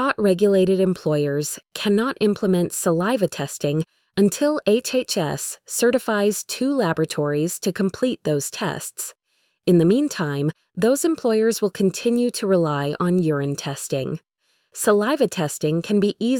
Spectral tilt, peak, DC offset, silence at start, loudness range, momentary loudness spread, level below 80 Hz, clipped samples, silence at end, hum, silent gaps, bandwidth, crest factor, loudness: -5 dB/octave; -6 dBFS; under 0.1%; 0 s; 2 LU; 8 LU; -60 dBFS; under 0.1%; 0 s; none; none; 19 kHz; 16 dB; -21 LUFS